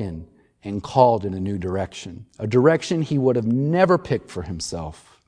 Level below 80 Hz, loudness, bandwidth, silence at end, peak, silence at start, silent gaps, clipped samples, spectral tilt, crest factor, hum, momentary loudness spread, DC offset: -48 dBFS; -21 LUFS; 10.5 kHz; 0.3 s; -2 dBFS; 0 s; none; under 0.1%; -6.5 dB/octave; 20 dB; none; 16 LU; under 0.1%